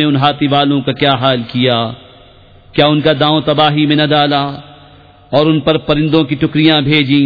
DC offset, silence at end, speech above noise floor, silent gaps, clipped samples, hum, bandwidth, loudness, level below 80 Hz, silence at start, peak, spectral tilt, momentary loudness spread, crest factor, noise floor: 0.2%; 0 s; 30 dB; none; under 0.1%; none; 5 kHz; -12 LUFS; -42 dBFS; 0 s; 0 dBFS; -8.5 dB/octave; 6 LU; 12 dB; -41 dBFS